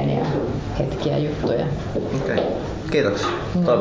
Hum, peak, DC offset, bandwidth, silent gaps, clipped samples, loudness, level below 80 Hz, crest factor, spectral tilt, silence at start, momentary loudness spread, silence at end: none; -6 dBFS; under 0.1%; 8 kHz; none; under 0.1%; -23 LUFS; -38 dBFS; 16 dB; -7 dB/octave; 0 s; 5 LU; 0 s